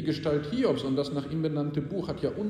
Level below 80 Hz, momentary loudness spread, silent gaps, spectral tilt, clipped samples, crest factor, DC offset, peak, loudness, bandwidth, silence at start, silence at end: -56 dBFS; 5 LU; none; -7.5 dB/octave; under 0.1%; 16 dB; under 0.1%; -14 dBFS; -30 LUFS; 10 kHz; 0 s; 0 s